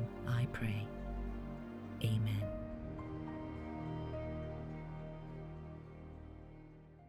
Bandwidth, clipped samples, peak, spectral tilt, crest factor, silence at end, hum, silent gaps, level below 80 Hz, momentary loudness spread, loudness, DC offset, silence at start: 14 kHz; under 0.1%; -24 dBFS; -7.5 dB/octave; 18 dB; 0 s; none; none; -52 dBFS; 16 LU; -43 LUFS; under 0.1%; 0 s